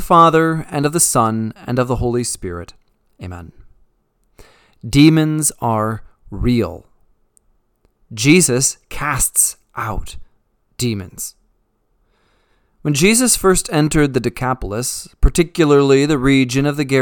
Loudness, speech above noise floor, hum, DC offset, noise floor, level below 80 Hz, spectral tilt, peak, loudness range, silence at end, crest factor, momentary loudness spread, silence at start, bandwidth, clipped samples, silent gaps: -15 LUFS; 47 dB; none; under 0.1%; -63 dBFS; -30 dBFS; -4.5 dB/octave; 0 dBFS; 8 LU; 0 s; 18 dB; 17 LU; 0 s; 19 kHz; under 0.1%; none